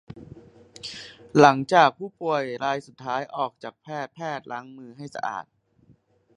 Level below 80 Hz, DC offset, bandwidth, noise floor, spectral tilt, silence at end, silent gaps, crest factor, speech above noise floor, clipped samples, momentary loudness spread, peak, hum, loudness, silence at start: -66 dBFS; under 0.1%; 10.5 kHz; -60 dBFS; -5.5 dB/octave; 0.95 s; none; 26 dB; 36 dB; under 0.1%; 23 LU; 0 dBFS; none; -24 LUFS; 0.1 s